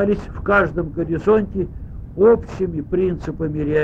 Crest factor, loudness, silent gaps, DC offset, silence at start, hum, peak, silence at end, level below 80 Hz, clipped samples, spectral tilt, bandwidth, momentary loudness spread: 16 dB; -19 LUFS; none; under 0.1%; 0 s; none; -4 dBFS; 0 s; -34 dBFS; under 0.1%; -9 dB/octave; 7.6 kHz; 11 LU